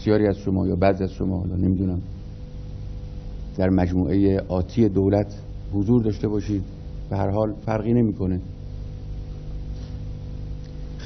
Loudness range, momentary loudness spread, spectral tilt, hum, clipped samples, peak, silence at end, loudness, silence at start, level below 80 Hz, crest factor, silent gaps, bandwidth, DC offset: 4 LU; 16 LU; -9.5 dB/octave; 50 Hz at -40 dBFS; under 0.1%; -4 dBFS; 0 s; -23 LUFS; 0 s; -36 dBFS; 20 dB; none; 6.4 kHz; under 0.1%